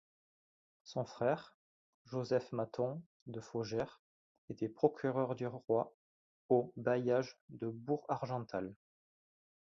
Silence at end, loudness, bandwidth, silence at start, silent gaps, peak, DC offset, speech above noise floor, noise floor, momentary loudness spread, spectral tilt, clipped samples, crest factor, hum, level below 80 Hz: 1 s; -38 LUFS; 7.4 kHz; 0.85 s; 1.54-2.05 s, 3.06-3.26 s, 3.99-4.48 s, 5.94-6.49 s, 7.41-7.48 s; -16 dBFS; under 0.1%; over 53 dB; under -90 dBFS; 12 LU; -6.5 dB/octave; under 0.1%; 24 dB; none; -76 dBFS